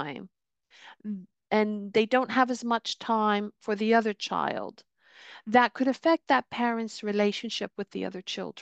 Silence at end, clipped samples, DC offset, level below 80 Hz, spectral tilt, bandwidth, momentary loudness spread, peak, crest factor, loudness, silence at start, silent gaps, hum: 0 s; under 0.1%; under 0.1%; -76 dBFS; -4.5 dB/octave; 8.6 kHz; 14 LU; -8 dBFS; 20 dB; -27 LUFS; 0 s; none; none